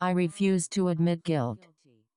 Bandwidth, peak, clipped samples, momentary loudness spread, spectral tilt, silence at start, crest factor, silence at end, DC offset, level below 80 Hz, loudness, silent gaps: 11 kHz; -14 dBFS; under 0.1%; 6 LU; -6 dB/octave; 0 s; 14 dB; 0.6 s; under 0.1%; -68 dBFS; -28 LUFS; none